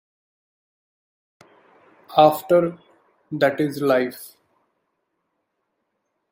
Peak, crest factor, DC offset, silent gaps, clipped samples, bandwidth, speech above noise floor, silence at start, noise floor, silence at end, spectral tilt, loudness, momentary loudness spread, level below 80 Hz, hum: -2 dBFS; 22 dB; under 0.1%; none; under 0.1%; 16.5 kHz; 57 dB; 2.1 s; -76 dBFS; 2.05 s; -6 dB/octave; -20 LUFS; 13 LU; -70 dBFS; none